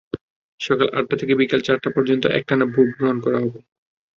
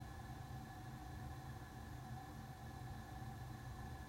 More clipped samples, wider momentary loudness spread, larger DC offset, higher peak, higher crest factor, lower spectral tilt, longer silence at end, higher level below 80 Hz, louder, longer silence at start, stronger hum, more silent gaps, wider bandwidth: neither; first, 8 LU vs 2 LU; neither; first, -2 dBFS vs -40 dBFS; first, 18 dB vs 12 dB; about the same, -6.5 dB/octave vs -6 dB/octave; first, 0.6 s vs 0 s; about the same, -58 dBFS vs -58 dBFS; first, -20 LUFS vs -53 LUFS; first, 0.15 s vs 0 s; neither; first, 0.21-0.58 s vs none; second, 7.2 kHz vs 16 kHz